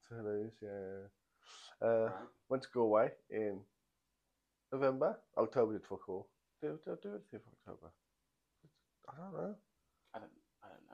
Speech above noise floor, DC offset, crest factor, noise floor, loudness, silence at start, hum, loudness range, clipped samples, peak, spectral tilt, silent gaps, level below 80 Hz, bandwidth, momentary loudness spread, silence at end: 46 dB; under 0.1%; 22 dB; -86 dBFS; -39 LUFS; 0.1 s; none; 15 LU; under 0.1%; -18 dBFS; -7.5 dB/octave; none; -80 dBFS; 9.4 kHz; 22 LU; 0.2 s